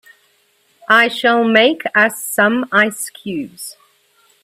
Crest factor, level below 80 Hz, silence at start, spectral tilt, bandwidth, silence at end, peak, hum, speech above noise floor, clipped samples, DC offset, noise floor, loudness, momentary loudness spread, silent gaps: 16 dB; -66 dBFS; 0.9 s; -3 dB/octave; 16 kHz; 0.7 s; 0 dBFS; none; 43 dB; under 0.1%; under 0.1%; -58 dBFS; -14 LUFS; 17 LU; none